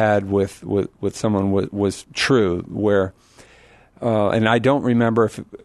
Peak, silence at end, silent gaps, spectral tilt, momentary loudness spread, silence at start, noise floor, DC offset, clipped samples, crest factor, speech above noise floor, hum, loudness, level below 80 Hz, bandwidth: -2 dBFS; 0.1 s; none; -6 dB/octave; 7 LU; 0 s; -50 dBFS; under 0.1%; under 0.1%; 18 dB; 31 dB; none; -20 LUFS; -52 dBFS; 12.5 kHz